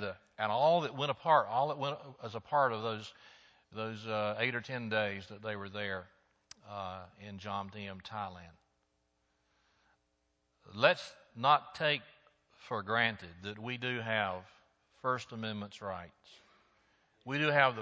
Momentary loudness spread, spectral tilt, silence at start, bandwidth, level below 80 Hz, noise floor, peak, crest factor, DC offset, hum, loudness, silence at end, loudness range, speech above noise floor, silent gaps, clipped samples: 16 LU; -5.5 dB/octave; 0 s; 8 kHz; -70 dBFS; -79 dBFS; -10 dBFS; 26 dB; under 0.1%; none; -34 LUFS; 0 s; 12 LU; 44 dB; none; under 0.1%